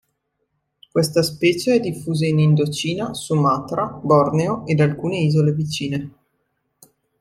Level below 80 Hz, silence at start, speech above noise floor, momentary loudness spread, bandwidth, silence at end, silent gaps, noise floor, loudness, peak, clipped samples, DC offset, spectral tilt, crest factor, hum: -56 dBFS; 0.95 s; 54 dB; 8 LU; 14 kHz; 1.1 s; none; -72 dBFS; -19 LUFS; -2 dBFS; under 0.1%; under 0.1%; -6.5 dB/octave; 18 dB; none